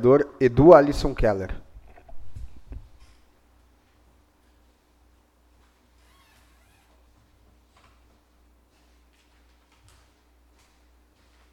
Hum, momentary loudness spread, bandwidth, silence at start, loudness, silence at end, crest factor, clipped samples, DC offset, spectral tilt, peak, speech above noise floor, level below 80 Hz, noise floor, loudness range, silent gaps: none; 32 LU; 11.5 kHz; 0 s; -18 LUFS; 8.75 s; 26 dB; under 0.1%; under 0.1%; -8 dB/octave; 0 dBFS; 43 dB; -40 dBFS; -60 dBFS; 30 LU; none